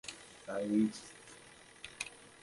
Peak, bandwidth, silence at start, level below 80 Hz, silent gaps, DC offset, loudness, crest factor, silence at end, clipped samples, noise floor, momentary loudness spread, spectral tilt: -18 dBFS; 11.5 kHz; 0.05 s; -72 dBFS; none; under 0.1%; -37 LUFS; 22 dB; 0.15 s; under 0.1%; -58 dBFS; 21 LU; -4.5 dB/octave